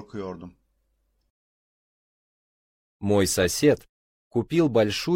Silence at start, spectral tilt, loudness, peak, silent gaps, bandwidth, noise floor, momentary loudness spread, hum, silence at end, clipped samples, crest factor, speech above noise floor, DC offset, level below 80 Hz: 0 s; -5 dB/octave; -23 LUFS; -6 dBFS; 1.30-3.00 s, 3.89-4.31 s; 16 kHz; -71 dBFS; 15 LU; none; 0 s; under 0.1%; 20 dB; 48 dB; under 0.1%; -54 dBFS